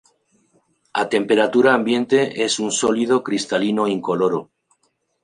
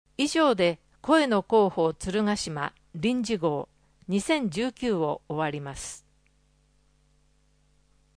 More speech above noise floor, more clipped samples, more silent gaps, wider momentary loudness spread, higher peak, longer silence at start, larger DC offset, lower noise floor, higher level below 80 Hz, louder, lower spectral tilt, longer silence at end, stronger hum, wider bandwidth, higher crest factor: first, 49 dB vs 39 dB; neither; neither; second, 6 LU vs 14 LU; first, -2 dBFS vs -8 dBFS; first, 0.95 s vs 0.2 s; neither; about the same, -68 dBFS vs -65 dBFS; second, -66 dBFS vs -56 dBFS; first, -19 LUFS vs -26 LUFS; about the same, -4 dB/octave vs -5 dB/octave; second, 0.8 s vs 2.2 s; second, none vs 50 Hz at -50 dBFS; about the same, 11 kHz vs 10.5 kHz; about the same, 18 dB vs 18 dB